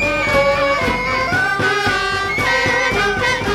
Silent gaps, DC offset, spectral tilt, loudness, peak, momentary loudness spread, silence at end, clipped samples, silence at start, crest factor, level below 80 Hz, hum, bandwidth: none; under 0.1%; -4 dB/octave; -16 LUFS; -4 dBFS; 3 LU; 0 s; under 0.1%; 0 s; 14 dB; -36 dBFS; none; 17 kHz